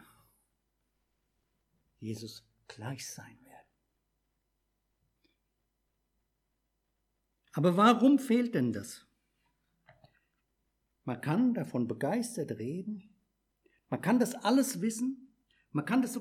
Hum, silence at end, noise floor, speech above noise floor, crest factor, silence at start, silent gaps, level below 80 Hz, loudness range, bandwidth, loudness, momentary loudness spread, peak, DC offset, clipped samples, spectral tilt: none; 0 s; -81 dBFS; 51 dB; 22 dB; 2 s; none; -80 dBFS; 17 LU; 16 kHz; -31 LUFS; 21 LU; -12 dBFS; under 0.1%; under 0.1%; -5.5 dB/octave